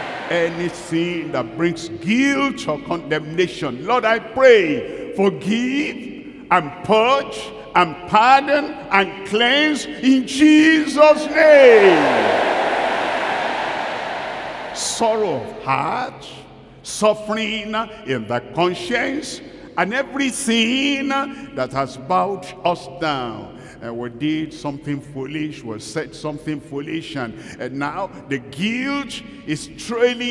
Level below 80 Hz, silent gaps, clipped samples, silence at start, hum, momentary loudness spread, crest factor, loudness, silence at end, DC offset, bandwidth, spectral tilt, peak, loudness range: -54 dBFS; none; under 0.1%; 0 s; none; 15 LU; 18 dB; -18 LUFS; 0 s; under 0.1%; 12 kHz; -4.5 dB/octave; 0 dBFS; 13 LU